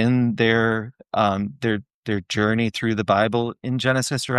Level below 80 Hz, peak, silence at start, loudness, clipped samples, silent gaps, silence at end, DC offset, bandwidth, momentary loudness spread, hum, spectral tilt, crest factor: -58 dBFS; -4 dBFS; 0 s; -22 LUFS; under 0.1%; 1.94-2.03 s; 0 s; under 0.1%; 12.5 kHz; 9 LU; none; -5.5 dB/octave; 16 dB